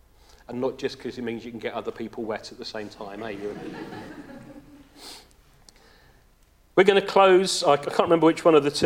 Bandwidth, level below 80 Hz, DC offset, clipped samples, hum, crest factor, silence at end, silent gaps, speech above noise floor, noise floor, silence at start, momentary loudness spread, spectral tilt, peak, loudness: 15.5 kHz; -58 dBFS; under 0.1%; under 0.1%; none; 22 dB; 0 s; none; 35 dB; -58 dBFS; 0.5 s; 24 LU; -4.5 dB/octave; -2 dBFS; -23 LUFS